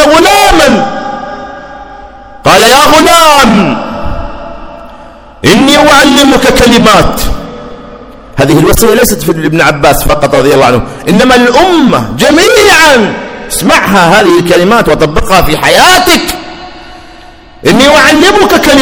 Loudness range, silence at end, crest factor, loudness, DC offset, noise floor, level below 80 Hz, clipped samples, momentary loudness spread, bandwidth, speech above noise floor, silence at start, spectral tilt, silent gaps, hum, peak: 2 LU; 0 s; 6 dB; -4 LUFS; under 0.1%; -31 dBFS; -22 dBFS; 10%; 17 LU; over 20 kHz; 27 dB; 0 s; -3.5 dB/octave; none; none; 0 dBFS